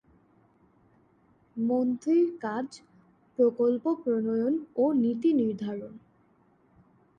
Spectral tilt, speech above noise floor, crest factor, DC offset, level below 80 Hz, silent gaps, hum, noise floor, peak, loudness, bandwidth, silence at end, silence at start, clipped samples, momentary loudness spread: -8 dB/octave; 38 dB; 16 dB; under 0.1%; -74 dBFS; none; none; -64 dBFS; -12 dBFS; -27 LUFS; 9 kHz; 1.2 s; 1.55 s; under 0.1%; 13 LU